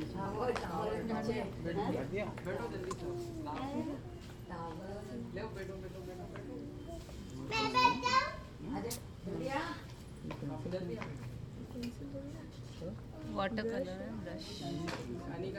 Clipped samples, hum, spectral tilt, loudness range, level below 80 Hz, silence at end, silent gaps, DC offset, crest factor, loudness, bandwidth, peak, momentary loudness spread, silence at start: under 0.1%; none; -5.5 dB/octave; 9 LU; -56 dBFS; 0 s; none; under 0.1%; 24 dB; -39 LUFS; over 20 kHz; -16 dBFS; 12 LU; 0 s